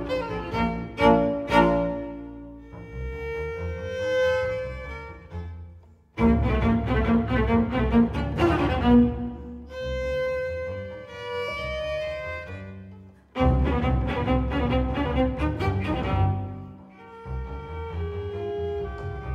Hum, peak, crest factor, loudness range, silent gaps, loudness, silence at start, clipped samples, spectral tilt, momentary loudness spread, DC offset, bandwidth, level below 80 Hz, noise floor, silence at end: none; -6 dBFS; 20 dB; 8 LU; none; -25 LUFS; 0 s; under 0.1%; -8 dB/octave; 18 LU; under 0.1%; 8.8 kHz; -34 dBFS; -49 dBFS; 0 s